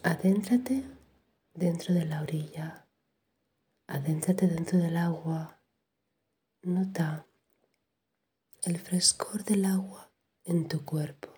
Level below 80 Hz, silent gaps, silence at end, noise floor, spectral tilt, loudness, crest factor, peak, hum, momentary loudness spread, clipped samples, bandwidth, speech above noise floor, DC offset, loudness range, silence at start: -70 dBFS; none; 0.1 s; -82 dBFS; -5 dB/octave; -30 LUFS; 22 dB; -10 dBFS; none; 15 LU; under 0.1%; over 20 kHz; 53 dB; under 0.1%; 6 LU; 0.05 s